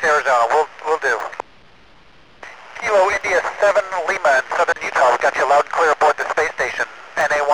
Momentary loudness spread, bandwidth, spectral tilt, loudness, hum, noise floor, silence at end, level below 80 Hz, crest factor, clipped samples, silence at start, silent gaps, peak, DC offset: 9 LU; 13.5 kHz; -2 dB/octave; -17 LUFS; none; -49 dBFS; 0 s; -56 dBFS; 14 dB; under 0.1%; 0 s; none; -6 dBFS; 0.4%